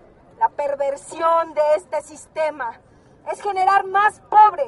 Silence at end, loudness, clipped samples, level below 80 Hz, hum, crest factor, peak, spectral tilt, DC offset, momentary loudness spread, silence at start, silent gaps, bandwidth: 0 s; -20 LUFS; under 0.1%; -62 dBFS; none; 18 dB; -2 dBFS; -3 dB/octave; under 0.1%; 14 LU; 0.4 s; none; 11.5 kHz